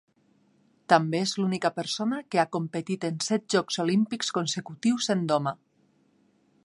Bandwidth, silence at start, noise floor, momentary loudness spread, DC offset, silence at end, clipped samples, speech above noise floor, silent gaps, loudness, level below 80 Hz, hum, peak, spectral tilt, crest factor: 11.5 kHz; 0.9 s; -66 dBFS; 8 LU; under 0.1%; 1.1 s; under 0.1%; 39 dB; none; -27 LUFS; -76 dBFS; none; -4 dBFS; -4.5 dB/octave; 24 dB